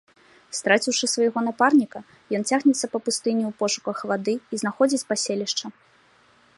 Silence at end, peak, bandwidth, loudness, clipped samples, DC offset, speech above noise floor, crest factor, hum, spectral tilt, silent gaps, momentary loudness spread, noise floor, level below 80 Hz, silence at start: 0.85 s; -2 dBFS; 11.5 kHz; -23 LUFS; under 0.1%; under 0.1%; 35 dB; 22 dB; none; -3 dB/octave; none; 9 LU; -58 dBFS; -74 dBFS; 0.5 s